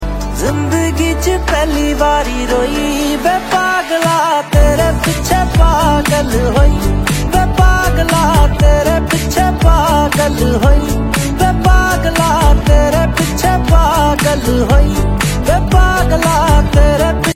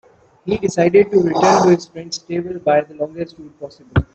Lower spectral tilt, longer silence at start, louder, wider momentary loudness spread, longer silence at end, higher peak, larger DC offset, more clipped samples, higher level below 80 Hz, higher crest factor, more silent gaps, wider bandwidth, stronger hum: about the same, -5 dB/octave vs -6 dB/octave; second, 0 s vs 0.45 s; first, -12 LUFS vs -16 LUFS; second, 4 LU vs 18 LU; about the same, 0 s vs 0.1 s; about the same, 0 dBFS vs -2 dBFS; neither; neither; first, -14 dBFS vs -42 dBFS; second, 10 dB vs 16 dB; neither; first, 16.5 kHz vs 8.4 kHz; neither